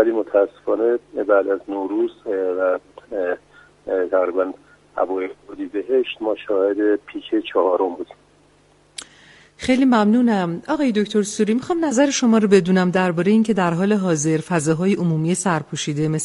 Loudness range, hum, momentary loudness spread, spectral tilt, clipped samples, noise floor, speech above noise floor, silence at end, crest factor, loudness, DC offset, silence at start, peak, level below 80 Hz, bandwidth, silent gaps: 6 LU; 50 Hz at -60 dBFS; 11 LU; -5.5 dB/octave; under 0.1%; -55 dBFS; 36 dB; 0 s; 18 dB; -20 LUFS; under 0.1%; 0 s; -2 dBFS; -58 dBFS; 11.5 kHz; none